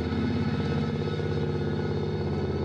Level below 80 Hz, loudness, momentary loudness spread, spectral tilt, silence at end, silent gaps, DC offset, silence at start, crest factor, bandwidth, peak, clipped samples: -44 dBFS; -29 LUFS; 2 LU; -8 dB/octave; 0 s; none; under 0.1%; 0 s; 8 dB; 7.6 kHz; -18 dBFS; under 0.1%